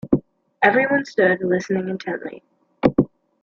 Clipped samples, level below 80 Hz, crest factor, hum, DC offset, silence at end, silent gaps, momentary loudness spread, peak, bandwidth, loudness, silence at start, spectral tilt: under 0.1%; -50 dBFS; 20 dB; none; under 0.1%; 0.35 s; none; 11 LU; -2 dBFS; 7.2 kHz; -20 LUFS; 0.05 s; -7 dB/octave